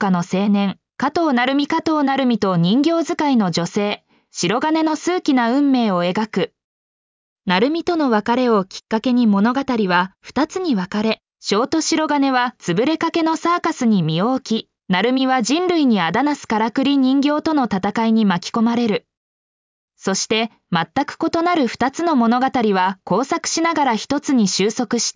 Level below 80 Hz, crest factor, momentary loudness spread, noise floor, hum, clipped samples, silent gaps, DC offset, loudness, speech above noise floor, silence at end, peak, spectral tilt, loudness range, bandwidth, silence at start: -58 dBFS; 14 dB; 6 LU; under -90 dBFS; none; under 0.1%; 6.64-7.36 s, 19.17-19.88 s; under 0.1%; -18 LUFS; over 72 dB; 0.05 s; -4 dBFS; -5 dB/octave; 2 LU; 7.6 kHz; 0 s